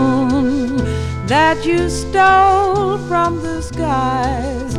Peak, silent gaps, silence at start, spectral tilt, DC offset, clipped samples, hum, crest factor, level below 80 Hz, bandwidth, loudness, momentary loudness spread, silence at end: 0 dBFS; none; 0 s; -5.5 dB/octave; under 0.1%; under 0.1%; none; 14 dB; -30 dBFS; 12.5 kHz; -15 LUFS; 10 LU; 0 s